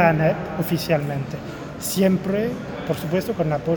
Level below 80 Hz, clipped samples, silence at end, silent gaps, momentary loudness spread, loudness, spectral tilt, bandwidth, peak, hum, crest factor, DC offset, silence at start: -48 dBFS; under 0.1%; 0 s; none; 10 LU; -23 LUFS; -6 dB/octave; over 20 kHz; -2 dBFS; none; 20 dB; under 0.1%; 0 s